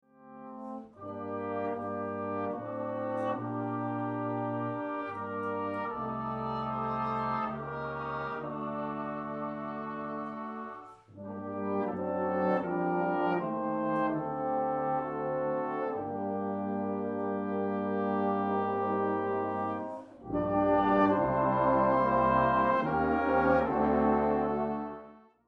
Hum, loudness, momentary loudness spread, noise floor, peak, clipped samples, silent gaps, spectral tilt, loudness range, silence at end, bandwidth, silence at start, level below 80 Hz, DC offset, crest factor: none; -31 LUFS; 12 LU; -52 dBFS; -14 dBFS; under 0.1%; none; -9.5 dB/octave; 10 LU; 0.3 s; 6.2 kHz; 0.2 s; -56 dBFS; under 0.1%; 18 dB